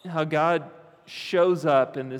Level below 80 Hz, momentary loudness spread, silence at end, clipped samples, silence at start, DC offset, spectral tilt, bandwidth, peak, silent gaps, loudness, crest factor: -84 dBFS; 11 LU; 0 s; under 0.1%; 0.05 s; under 0.1%; -6.5 dB/octave; 13.5 kHz; -8 dBFS; none; -23 LUFS; 16 dB